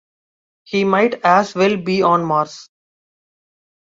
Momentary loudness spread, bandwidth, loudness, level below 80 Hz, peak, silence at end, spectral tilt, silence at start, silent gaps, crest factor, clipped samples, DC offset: 6 LU; 7.8 kHz; -16 LUFS; -62 dBFS; -2 dBFS; 1.35 s; -6 dB/octave; 0.7 s; none; 18 dB; under 0.1%; under 0.1%